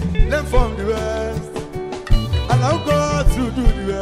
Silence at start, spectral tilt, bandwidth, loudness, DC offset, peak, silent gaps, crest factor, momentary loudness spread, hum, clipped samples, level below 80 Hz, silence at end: 0 s; -6 dB/octave; 14 kHz; -20 LUFS; 0.2%; -2 dBFS; none; 14 dB; 10 LU; none; under 0.1%; -20 dBFS; 0 s